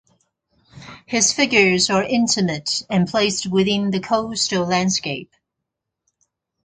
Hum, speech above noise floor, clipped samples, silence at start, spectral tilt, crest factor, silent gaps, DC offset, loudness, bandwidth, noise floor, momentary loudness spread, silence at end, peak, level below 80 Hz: none; 62 dB; under 0.1%; 0.75 s; -3.5 dB/octave; 20 dB; none; under 0.1%; -18 LUFS; 9.6 kHz; -81 dBFS; 8 LU; 1.4 s; 0 dBFS; -54 dBFS